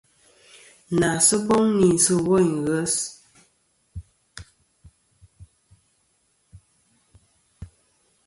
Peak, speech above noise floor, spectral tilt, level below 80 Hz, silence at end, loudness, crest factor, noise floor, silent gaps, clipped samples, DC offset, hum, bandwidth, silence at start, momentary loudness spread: -4 dBFS; 48 dB; -4 dB/octave; -52 dBFS; 0.6 s; -20 LUFS; 20 dB; -67 dBFS; none; under 0.1%; under 0.1%; none; 12 kHz; 0.9 s; 26 LU